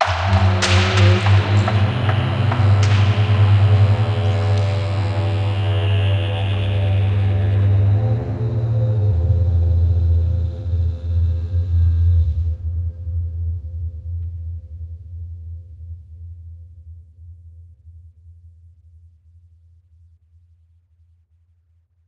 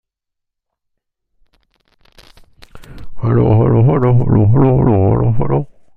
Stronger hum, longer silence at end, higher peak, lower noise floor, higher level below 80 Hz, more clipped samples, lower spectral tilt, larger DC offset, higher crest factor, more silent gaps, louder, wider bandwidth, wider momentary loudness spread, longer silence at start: neither; first, 3.75 s vs 0.3 s; about the same, -2 dBFS vs -2 dBFS; second, -59 dBFS vs -78 dBFS; about the same, -30 dBFS vs -34 dBFS; neither; second, -6.5 dB/octave vs -11.5 dB/octave; neither; about the same, 18 dB vs 14 dB; neither; second, -18 LUFS vs -13 LUFS; first, 8.6 kHz vs 4.4 kHz; first, 19 LU vs 7 LU; second, 0 s vs 2.75 s